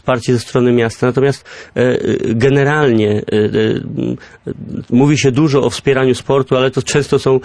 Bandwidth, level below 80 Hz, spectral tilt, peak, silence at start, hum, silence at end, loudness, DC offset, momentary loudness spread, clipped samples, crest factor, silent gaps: 11 kHz; -44 dBFS; -6 dB/octave; -2 dBFS; 0.05 s; none; 0 s; -14 LUFS; under 0.1%; 10 LU; under 0.1%; 12 dB; none